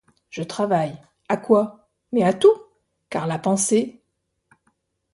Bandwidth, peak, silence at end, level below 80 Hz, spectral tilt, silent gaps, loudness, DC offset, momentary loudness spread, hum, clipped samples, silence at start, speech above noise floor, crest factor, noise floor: 11.5 kHz; -2 dBFS; 1.2 s; -66 dBFS; -5 dB/octave; none; -21 LUFS; under 0.1%; 14 LU; none; under 0.1%; 0.35 s; 55 dB; 20 dB; -74 dBFS